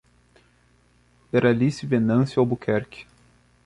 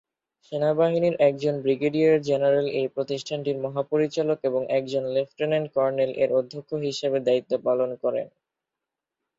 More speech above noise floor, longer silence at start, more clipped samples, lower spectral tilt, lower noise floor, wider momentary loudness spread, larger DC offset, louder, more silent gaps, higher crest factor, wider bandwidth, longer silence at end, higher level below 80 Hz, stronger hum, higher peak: second, 39 dB vs 63 dB; first, 1.35 s vs 0.5 s; neither; first, -8 dB/octave vs -6.5 dB/octave; second, -60 dBFS vs -87 dBFS; about the same, 8 LU vs 7 LU; neither; about the same, -22 LUFS vs -24 LUFS; neither; about the same, 18 dB vs 16 dB; first, 11 kHz vs 7.8 kHz; second, 0.65 s vs 1.1 s; first, -56 dBFS vs -70 dBFS; first, 60 Hz at -40 dBFS vs none; about the same, -6 dBFS vs -8 dBFS